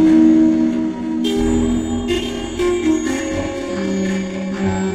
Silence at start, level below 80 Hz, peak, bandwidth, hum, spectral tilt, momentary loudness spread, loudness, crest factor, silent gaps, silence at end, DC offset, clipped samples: 0 s; -34 dBFS; -2 dBFS; 11 kHz; none; -6 dB/octave; 10 LU; -18 LUFS; 14 dB; none; 0 s; under 0.1%; under 0.1%